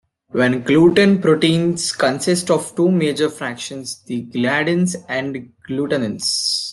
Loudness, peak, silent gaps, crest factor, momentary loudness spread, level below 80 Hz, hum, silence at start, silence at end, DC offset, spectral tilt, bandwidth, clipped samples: -18 LUFS; -2 dBFS; none; 16 dB; 13 LU; -58 dBFS; none; 0.35 s; 0 s; under 0.1%; -4.5 dB/octave; 12.5 kHz; under 0.1%